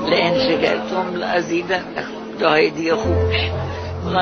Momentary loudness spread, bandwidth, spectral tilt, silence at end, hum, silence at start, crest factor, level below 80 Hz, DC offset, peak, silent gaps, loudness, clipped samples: 10 LU; 6.6 kHz; -3.5 dB/octave; 0 s; none; 0 s; 18 dB; -38 dBFS; under 0.1%; -2 dBFS; none; -19 LUFS; under 0.1%